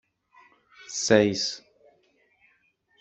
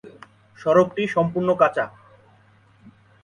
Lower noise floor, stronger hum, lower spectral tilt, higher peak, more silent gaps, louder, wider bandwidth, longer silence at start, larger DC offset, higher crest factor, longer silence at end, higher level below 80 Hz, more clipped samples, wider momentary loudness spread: first, -67 dBFS vs -55 dBFS; neither; second, -3.5 dB/octave vs -7 dB/octave; second, -6 dBFS vs -2 dBFS; neither; second, -24 LUFS vs -21 LUFS; second, 8.2 kHz vs 10.5 kHz; first, 0.9 s vs 0.05 s; neither; about the same, 24 dB vs 20 dB; about the same, 1.45 s vs 1.35 s; second, -68 dBFS vs -62 dBFS; neither; first, 15 LU vs 10 LU